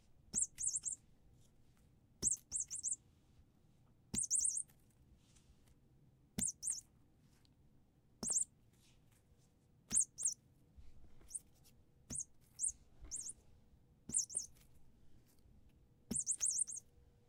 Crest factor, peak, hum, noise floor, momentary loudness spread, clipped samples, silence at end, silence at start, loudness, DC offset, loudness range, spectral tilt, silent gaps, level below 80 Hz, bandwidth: 24 dB; -22 dBFS; none; -71 dBFS; 14 LU; under 0.1%; 0.5 s; 0.35 s; -39 LUFS; under 0.1%; 6 LU; -1 dB/octave; none; -68 dBFS; 16.5 kHz